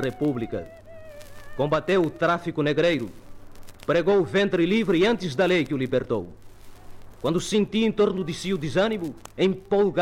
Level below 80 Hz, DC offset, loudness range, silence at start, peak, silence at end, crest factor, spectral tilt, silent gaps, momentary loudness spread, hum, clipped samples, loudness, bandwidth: -50 dBFS; under 0.1%; 3 LU; 0 s; -12 dBFS; 0 s; 12 dB; -6 dB/octave; none; 13 LU; none; under 0.1%; -24 LUFS; 15.5 kHz